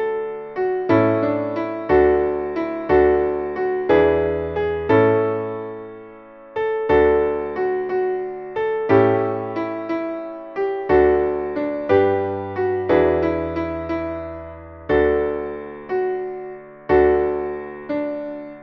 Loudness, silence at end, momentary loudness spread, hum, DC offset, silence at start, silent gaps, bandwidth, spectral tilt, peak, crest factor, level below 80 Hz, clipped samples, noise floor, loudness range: -20 LUFS; 0 s; 14 LU; none; under 0.1%; 0 s; none; 5.8 kHz; -9.5 dB/octave; -2 dBFS; 18 dB; -42 dBFS; under 0.1%; -41 dBFS; 4 LU